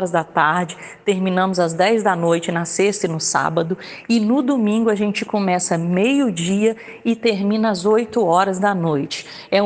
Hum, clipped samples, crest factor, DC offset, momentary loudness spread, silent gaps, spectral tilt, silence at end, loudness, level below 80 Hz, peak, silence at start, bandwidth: none; under 0.1%; 16 dB; under 0.1%; 6 LU; none; -5 dB/octave; 0 s; -19 LUFS; -62 dBFS; -2 dBFS; 0 s; 9.8 kHz